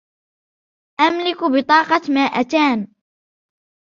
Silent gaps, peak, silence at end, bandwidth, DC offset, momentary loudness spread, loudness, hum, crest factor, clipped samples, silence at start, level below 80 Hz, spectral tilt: none; -2 dBFS; 1.15 s; 7.2 kHz; under 0.1%; 9 LU; -17 LUFS; none; 18 dB; under 0.1%; 1 s; -66 dBFS; -4.5 dB/octave